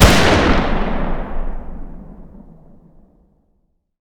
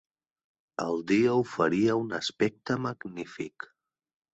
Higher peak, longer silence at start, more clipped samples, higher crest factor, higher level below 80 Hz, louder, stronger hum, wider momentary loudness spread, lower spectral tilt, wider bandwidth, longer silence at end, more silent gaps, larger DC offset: first, 0 dBFS vs -12 dBFS; second, 0 s vs 0.8 s; first, 0.1% vs under 0.1%; about the same, 18 dB vs 18 dB; first, -22 dBFS vs -68 dBFS; first, -17 LUFS vs -28 LUFS; neither; first, 25 LU vs 15 LU; second, -4.5 dB/octave vs -6 dB/octave; first, over 20 kHz vs 8.2 kHz; first, 1.45 s vs 0.85 s; neither; neither